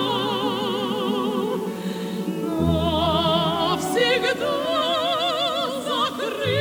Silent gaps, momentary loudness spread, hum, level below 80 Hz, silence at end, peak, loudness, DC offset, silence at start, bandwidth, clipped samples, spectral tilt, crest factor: none; 7 LU; none; -44 dBFS; 0 s; -8 dBFS; -22 LUFS; under 0.1%; 0 s; over 20 kHz; under 0.1%; -5 dB/octave; 16 dB